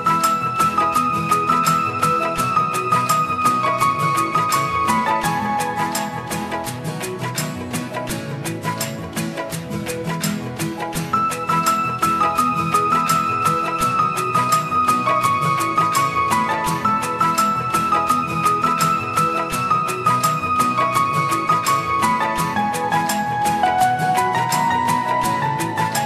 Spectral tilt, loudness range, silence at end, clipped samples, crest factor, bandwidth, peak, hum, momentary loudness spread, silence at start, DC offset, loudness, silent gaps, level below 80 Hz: -4 dB/octave; 7 LU; 0 s; under 0.1%; 16 dB; 14 kHz; -4 dBFS; none; 8 LU; 0 s; under 0.1%; -19 LUFS; none; -52 dBFS